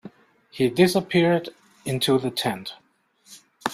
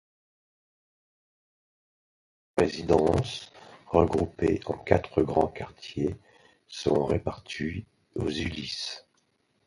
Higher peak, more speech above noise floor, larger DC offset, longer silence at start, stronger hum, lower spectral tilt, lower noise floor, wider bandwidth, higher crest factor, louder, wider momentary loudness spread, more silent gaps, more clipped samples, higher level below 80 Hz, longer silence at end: about the same, -4 dBFS vs -4 dBFS; second, 36 dB vs 44 dB; neither; second, 0.05 s vs 2.55 s; neither; about the same, -5.5 dB/octave vs -6 dB/octave; second, -58 dBFS vs -71 dBFS; first, 16 kHz vs 11.5 kHz; second, 20 dB vs 26 dB; first, -23 LUFS vs -28 LUFS; first, 18 LU vs 15 LU; neither; neither; second, -62 dBFS vs -46 dBFS; second, 0 s vs 0.7 s